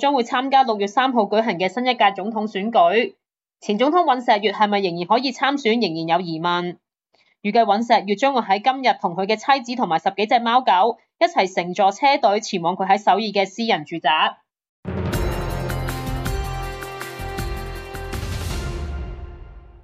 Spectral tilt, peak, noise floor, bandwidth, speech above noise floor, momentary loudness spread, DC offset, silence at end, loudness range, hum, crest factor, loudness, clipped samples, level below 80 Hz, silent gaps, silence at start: -5 dB/octave; -4 dBFS; -63 dBFS; 15.5 kHz; 44 dB; 13 LU; under 0.1%; 0.05 s; 9 LU; none; 16 dB; -20 LUFS; under 0.1%; -38 dBFS; 14.69-14.83 s; 0 s